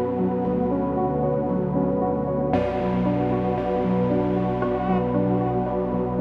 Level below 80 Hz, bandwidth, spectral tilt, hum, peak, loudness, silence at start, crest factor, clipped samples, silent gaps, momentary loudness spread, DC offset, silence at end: -42 dBFS; 5.2 kHz; -10.5 dB/octave; none; -10 dBFS; -23 LUFS; 0 s; 14 dB; under 0.1%; none; 2 LU; under 0.1%; 0 s